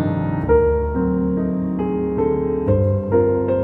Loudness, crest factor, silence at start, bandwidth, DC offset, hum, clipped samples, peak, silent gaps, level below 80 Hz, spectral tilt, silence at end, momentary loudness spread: -19 LUFS; 14 dB; 0 s; 4.1 kHz; under 0.1%; none; under 0.1%; -4 dBFS; none; -32 dBFS; -12 dB/octave; 0 s; 5 LU